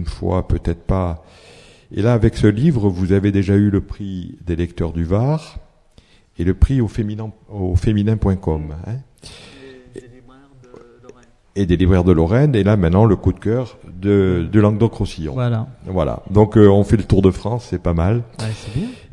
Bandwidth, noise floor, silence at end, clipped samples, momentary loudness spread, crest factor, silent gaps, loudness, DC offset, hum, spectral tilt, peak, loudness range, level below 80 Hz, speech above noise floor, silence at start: 11 kHz; -50 dBFS; 0.15 s; under 0.1%; 14 LU; 18 dB; none; -17 LUFS; under 0.1%; none; -8.5 dB/octave; 0 dBFS; 7 LU; -32 dBFS; 34 dB; 0 s